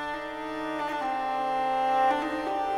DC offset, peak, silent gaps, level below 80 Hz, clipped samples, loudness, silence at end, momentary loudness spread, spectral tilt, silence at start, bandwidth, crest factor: under 0.1%; -14 dBFS; none; -58 dBFS; under 0.1%; -28 LUFS; 0 s; 9 LU; -4 dB/octave; 0 s; 13 kHz; 14 dB